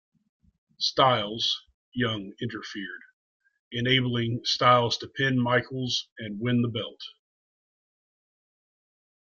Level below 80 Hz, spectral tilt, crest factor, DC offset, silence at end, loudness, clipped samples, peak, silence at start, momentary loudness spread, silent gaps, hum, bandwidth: -64 dBFS; -5 dB/octave; 24 dB; under 0.1%; 2.15 s; -26 LUFS; under 0.1%; -6 dBFS; 0.8 s; 16 LU; 1.74-1.92 s, 3.13-3.40 s, 3.59-3.71 s, 6.12-6.16 s; none; 7.4 kHz